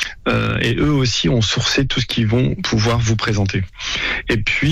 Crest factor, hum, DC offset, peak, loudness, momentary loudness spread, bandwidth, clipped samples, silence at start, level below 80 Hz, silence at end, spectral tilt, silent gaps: 10 dB; none; under 0.1%; -6 dBFS; -17 LUFS; 3 LU; 12.5 kHz; under 0.1%; 0 s; -32 dBFS; 0 s; -5 dB/octave; none